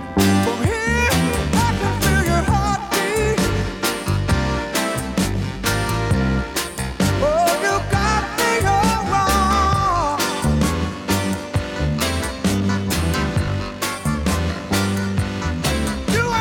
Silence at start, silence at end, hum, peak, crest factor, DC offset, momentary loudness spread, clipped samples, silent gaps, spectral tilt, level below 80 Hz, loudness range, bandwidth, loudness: 0 s; 0 s; none; -4 dBFS; 14 dB; under 0.1%; 6 LU; under 0.1%; none; -5 dB/octave; -28 dBFS; 3 LU; 19.5 kHz; -19 LUFS